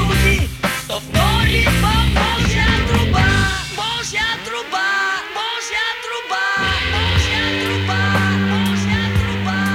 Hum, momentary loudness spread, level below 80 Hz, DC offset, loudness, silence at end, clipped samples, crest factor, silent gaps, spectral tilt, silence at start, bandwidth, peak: none; 6 LU; -26 dBFS; under 0.1%; -17 LUFS; 0 s; under 0.1%; 16 dB; none; -4.5 dB/octave; 0 s; 17 kHz; -2 dBFS